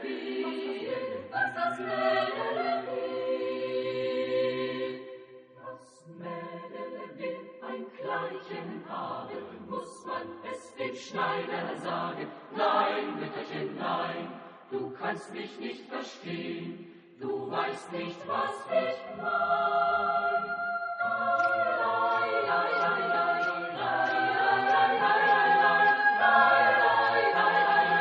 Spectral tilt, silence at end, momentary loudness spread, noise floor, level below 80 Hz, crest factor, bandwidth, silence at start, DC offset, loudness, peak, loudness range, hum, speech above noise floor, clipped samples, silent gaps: -5 dB/octave; 0 s; 17 LU; -50 dBFS; -76 dBFS; 22 dB; 10 kHz; 0 s; under 0.1%; -28 LUFS; -8 dBFS; 15 LU; none; 19 dB; under 0.1%; none